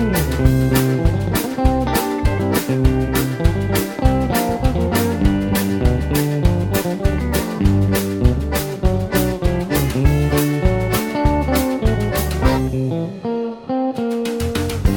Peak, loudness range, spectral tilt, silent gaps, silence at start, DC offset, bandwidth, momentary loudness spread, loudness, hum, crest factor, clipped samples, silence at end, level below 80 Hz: 0 dBFS; 2 LU; -6 dB/octave; none; 0 s; under 0.1%; 18 kHz; 5 LU; -18 LUFS; none; 16 dB; under 0.1%; 0 s; -24 dBFS